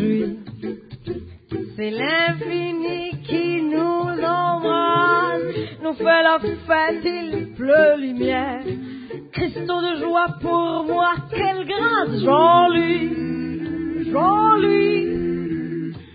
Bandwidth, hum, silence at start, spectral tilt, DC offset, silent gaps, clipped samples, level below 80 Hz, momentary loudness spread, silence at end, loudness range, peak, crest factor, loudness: 5 kHz; none; 0 s; -10.5 dB/octave; under 0.1%; none; under 0.1%; -48 dBFS; 15 LU; 0.05 s; 5 LU; -4 dBFS; 16 dB; -20 LUFS